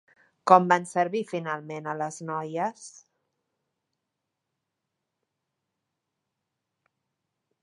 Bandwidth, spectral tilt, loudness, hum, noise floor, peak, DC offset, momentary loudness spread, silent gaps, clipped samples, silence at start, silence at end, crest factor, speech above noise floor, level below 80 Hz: 11.5 kHz; -5.5 dB/octave; -26 LUFS; none; -84 dBFS; -2 dBFS; under 0.1%; 15 LU; none; under 0.1%; 0.45 s; 4.75 s; 28 dB; 58 dB; -84 dBFS